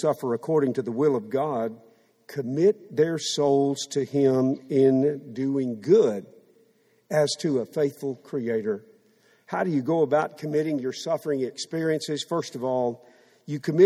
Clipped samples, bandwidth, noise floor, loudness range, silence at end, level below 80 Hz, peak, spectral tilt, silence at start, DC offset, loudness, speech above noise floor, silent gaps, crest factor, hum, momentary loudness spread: under 0.1%; 14.5 kHz; -63 dBFS; 5 LU; 0 s; -72 dBFS; -6 dBFS; -6 dB/octave; 0 s; under 0.1%; -25 LUFS; 39 dB; none; 18 dB; none; 10 LU